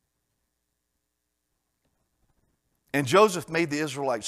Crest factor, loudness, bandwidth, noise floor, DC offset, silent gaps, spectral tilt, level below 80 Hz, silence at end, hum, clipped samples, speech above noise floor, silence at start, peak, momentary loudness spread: 24 dB; -24 LUFS; 15 kHz; -80 dBFS; under 0.1%; none; -4.5 dB/octave; -70 dBFS; 0 s; none; under 0.1%; 56 dB; 2.95 s; -6 dBFS; 9 LU